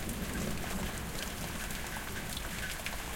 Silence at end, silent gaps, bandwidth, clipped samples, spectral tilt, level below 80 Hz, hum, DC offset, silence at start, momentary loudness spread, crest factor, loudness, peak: 0 s; none; 17 kHz; under 0.1%; -3.5 dB/octave; -44 dBFS; none; under 0.1%; 0 s; 2 LU; 16 dB; -38 LUFS; -20 dBFS